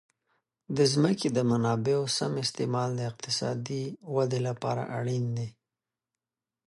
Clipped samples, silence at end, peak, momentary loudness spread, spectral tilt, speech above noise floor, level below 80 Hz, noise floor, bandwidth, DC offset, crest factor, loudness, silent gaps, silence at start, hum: under 0.1%; 1.2 s; -12 dBFS; 9 LU; -5.5 dB/octave; over 62 dB; -68 dBFS; under -90 dBFS; 11.5 kHz; under 0.1%; 18 dB; -29 LUFS; none; 0.7 s; none